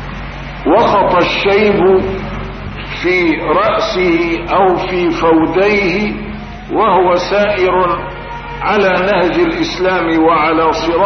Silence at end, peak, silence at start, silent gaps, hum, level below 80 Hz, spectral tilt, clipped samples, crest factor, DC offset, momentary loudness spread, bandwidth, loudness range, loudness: 0 s; -2 dBFS; 0 s; none; none; -32 dBFS; -6 dB/octave; under 0.1%; 12 dB; under 0.1%; 13 LU; 6.4 kHz; 1 LU; -12 LUFS